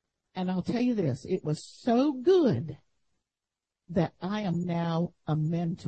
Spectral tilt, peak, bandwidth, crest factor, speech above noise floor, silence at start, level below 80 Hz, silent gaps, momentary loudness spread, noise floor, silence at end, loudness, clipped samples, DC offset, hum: -8 dB/octave; -14 dBFS; 8.6 kHz; 16 dB; over 62 dB; 0.35 s; -64 dBFS; none; 10 LU; under -90 dBFS; 0 s; -29 LUFS; under 0.1%; under 0.1%; none